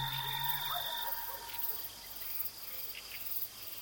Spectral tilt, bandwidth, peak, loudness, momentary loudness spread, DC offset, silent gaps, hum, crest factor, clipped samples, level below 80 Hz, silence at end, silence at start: -1.5 dB/octave; 17 kHz; -20 dBFS; -36 LUFS; 7 LU; under 0.1%; none; none; 20 dB; under 0.1%; -68 dBFS; 0 s; 0 s